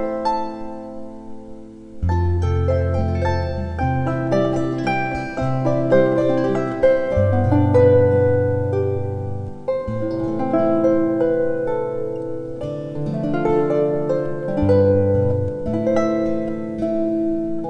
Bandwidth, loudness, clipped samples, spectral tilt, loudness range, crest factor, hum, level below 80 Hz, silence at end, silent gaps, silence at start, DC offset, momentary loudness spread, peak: 8.4 kHz; -20 LUFS; under 0.1%; -9 dB/octave; 5 LU; 16 dB; none; -38 dBFS; 0 s; none; 0 s; under 0.1%; 12 LU; -4 dBFS